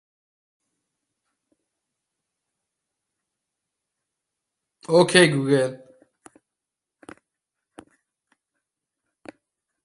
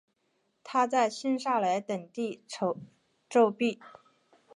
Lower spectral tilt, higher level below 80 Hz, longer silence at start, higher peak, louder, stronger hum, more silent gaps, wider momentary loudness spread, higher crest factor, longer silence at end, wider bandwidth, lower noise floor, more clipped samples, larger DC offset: about the same, -4.5 dB/octave vs -5 dB/octave; first, -70 dBFS vs -84 dBFS; first, 4.9 s vs 0.65 s; first, -2 dBFS vs -12 dBFS; first, -19 LUFS vs -29 LUFS; neither; neither; about the same, 13 LU vs 11 LU; first, 26 dB vs 18 dB; first, 4.1 s vs 0.7 s; about the same, 11.5 kHz vs 11 kHz; first, -86 dBFS vs -75 dBFS; neither; neither